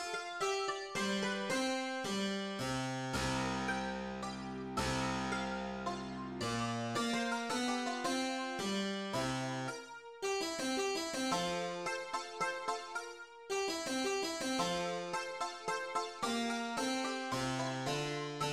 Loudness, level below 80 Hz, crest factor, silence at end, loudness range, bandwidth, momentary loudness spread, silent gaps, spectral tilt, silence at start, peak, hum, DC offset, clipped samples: -37 LUFS; -60 dBFS; 16 dB; 0 s; 1 LU; 16 kHz; 6 LU; none; -3.5 dB/octave; 0 s; -22 dBFS; none; under 0.1%; under 0.1%